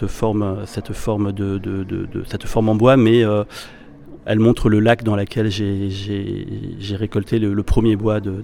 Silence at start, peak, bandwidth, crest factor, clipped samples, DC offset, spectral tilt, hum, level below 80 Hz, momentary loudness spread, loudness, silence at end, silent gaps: 0 s; 0 dBFS; 13.5 kHz; 18 dB; under 0.1%; under 0.1%; -7.5 dB/octave; none; -34 dBFS; 13 LU; -19 LUFS; 0 s; none